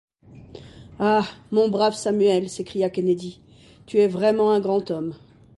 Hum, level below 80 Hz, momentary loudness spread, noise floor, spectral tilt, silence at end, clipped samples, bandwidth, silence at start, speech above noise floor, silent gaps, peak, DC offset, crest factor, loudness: none; -58 dBFS; 10 LU; -44 dBFS; -6 dB/octave; 0.45 s; under 0.1%; 11.5 kHz; 0.3 s; 23 dB; none; -8 dBFS; under 0.1%; 14 dB; -22 LUFS